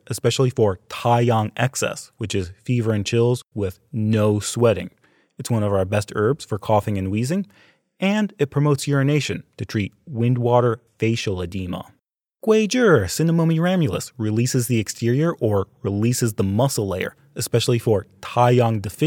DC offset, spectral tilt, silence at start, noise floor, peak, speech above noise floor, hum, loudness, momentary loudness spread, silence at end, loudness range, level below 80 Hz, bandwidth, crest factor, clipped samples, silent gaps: under 0.1%; -6 dB/octave; 0.1 s; -49 dBFS; -2 dBFS; 29 dB; none; -21 LUFS; 10 LU; 0 s; 3 LU; -58 dBFS; 18 kHz; 18 dB; under 0.1%; none